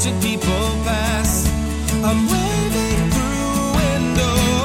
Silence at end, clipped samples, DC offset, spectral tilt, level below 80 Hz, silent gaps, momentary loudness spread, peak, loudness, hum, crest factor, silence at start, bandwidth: 0 s; under 0.1%; under 0.1%; -4.5 dB/octave; -26 dBFS; none; 3 LU; -4 dBFS; -18 LUFS; none; 14 dB; 0 s; 17 kHz